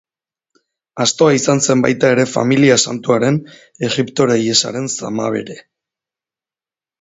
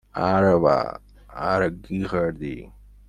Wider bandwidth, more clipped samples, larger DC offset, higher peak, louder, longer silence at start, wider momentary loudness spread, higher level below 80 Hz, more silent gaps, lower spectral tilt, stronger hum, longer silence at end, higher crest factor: second, 8 kHz vs 10 kHz; neither; neither; first, 0 dBFS vs -4 dBFS; first, -15 LUFS vs -22 LUFS; first, 0.95 s vs 0.15 s; second, 10 LU vs 18 LU; second, -58 dBFS vs -46 dBFS; neither; second, -4 dB/octave vs -8 dB/octave; neither; first, 1.4 s vs 0.4 s; about the same, 16 dB vs 20 dB